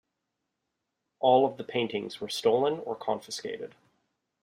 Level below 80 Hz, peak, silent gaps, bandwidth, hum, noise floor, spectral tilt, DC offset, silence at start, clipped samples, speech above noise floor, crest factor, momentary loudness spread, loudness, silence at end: -76 dBFS; -10 dBFS; none; 15.5 kHz; none; -83 dBFS; -4.5 dB/octave; under 0.1%; 1.2 s; under 0.1%; 55 dB; 20 dB; 14 LU; -28 LUFS; 0.75 s